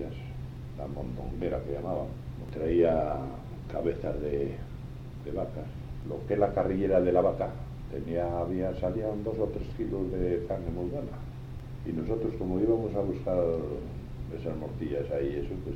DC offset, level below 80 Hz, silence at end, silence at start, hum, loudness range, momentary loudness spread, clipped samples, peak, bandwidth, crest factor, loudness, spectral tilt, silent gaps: under 0.1%; -44 dBFS; 0 s; 0 s; none; 4 LU; 15 LU; under 0.1%; -12 dBFS; 10 kHz; 18 dB; -32 LUFS; -9.5 dB/octave; none